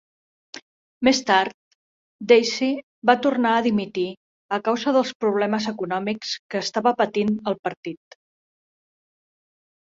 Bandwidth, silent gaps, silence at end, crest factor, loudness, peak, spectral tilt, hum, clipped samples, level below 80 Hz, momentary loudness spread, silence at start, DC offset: 7.8 kHz; 0.62-1.01 s, 1.54-2.19 s, 2.83-3.02 s, 4.17-4.49 s, 5.15-5.20 s, 6.39-6.49 s, 7.59-7.63 s, 7.77-7.83 s; 1.95 s; 22 dB; -22 LUFS; -2 dBFS; -4.5 dB/octave; none; under 0.1%; -64 dBFS; 17 LU; 0.55 s; under 0.1%